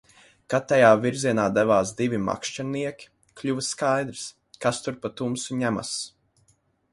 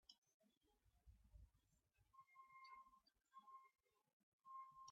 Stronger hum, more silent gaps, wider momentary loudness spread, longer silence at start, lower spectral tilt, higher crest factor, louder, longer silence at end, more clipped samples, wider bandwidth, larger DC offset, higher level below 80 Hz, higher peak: neither; second, none vs 0.18-0.22 s, 0.34-0.40 s, 0.57-0.61 s, 4.13-4.39 s; first, 14 LU vs 8 LU; first, 0.5 s vs 0.05 s; first, -4.5 dB/octave vs -1.5 dB/octave; about the same, 22 dB vs 20 dB; first, -24 LUFS vs -65 LUFS; first, 0.85 s vs 0 s; neither; first, 11.5 kHz vs 7.4 kHz; neither; first, -60 dBFS vs -80 dBFS; first, -4 dBFS vs -48 dBFS